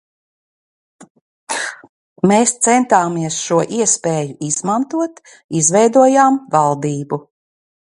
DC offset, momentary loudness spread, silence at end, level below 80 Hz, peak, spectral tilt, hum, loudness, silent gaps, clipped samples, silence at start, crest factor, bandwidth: under 0.1%; 12 LU; 0.7 s; -64 dBFS; 0 dBFS; -4 dB/octave; none; -15 LUFS; 1.10-1.15 s, 1.21-1.47 s, 1.89-2.16 s, 5.44-5.49 s; under 0.1%; 1 s; 16 dB; 11.5 kHz